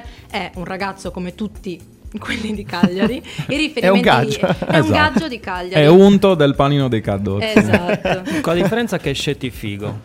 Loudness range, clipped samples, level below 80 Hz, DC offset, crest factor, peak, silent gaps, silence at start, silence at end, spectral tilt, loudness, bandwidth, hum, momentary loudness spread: 8 LU; under 0.1%; -40 dBFS; under 0.1%; 16 dB; 0 dBFS; none; 0 s; 0 s; -6 dB/octave; -16 LUFS; 16 kHz; none; 15 LU